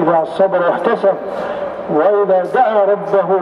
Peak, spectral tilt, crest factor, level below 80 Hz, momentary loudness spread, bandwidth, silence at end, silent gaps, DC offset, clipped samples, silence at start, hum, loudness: 0 dBFS; -7.5 dB/octave; 14 dB; -58 dBFS; 9 LU; 10.5 kHz; 0 s; none; under 0.1%; under 0.1%; 0 s; none; -15 LUFS